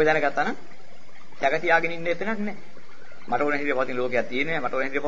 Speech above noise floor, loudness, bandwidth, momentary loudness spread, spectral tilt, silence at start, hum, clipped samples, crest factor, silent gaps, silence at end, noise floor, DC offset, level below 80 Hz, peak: 26 dB; -25 LUFS; 7.8 kHz; 9 LU; -5.5 dB/octave; 0 s; none; under 0.1%; 18 dB; none; 0 s; -51 dBFS; 4%; -62 dBFS; -6 dBFS